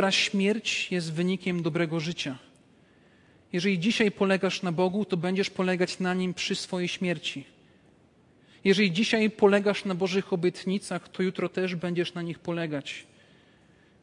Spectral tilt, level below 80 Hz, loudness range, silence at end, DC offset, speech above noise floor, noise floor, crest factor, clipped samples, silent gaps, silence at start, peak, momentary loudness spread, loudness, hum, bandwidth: -5 dB/octave; -70 dBFS; 5 LU; 1 s; under 0.1%; 33 dB; -60 dBFS; 22 dB; under 0.1%; none; 0 s; -8 dBFS; 10 LU; -27 LUFS; none; 11 kHz